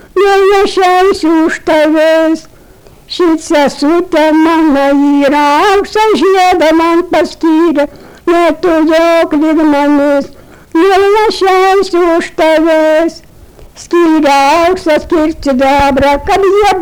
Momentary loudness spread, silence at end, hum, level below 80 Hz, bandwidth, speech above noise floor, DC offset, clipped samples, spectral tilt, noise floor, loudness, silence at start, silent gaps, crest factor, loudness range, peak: 5 LU; 0 s; none; -34 dBFS; 19.5 kHz; 30 dB; under 0.1%; under 0.1%; -4 dB/octave; -38 dBFS; -9 LUFS; 0.15 s; none; 6 dB; 2 LU; -4 dBFS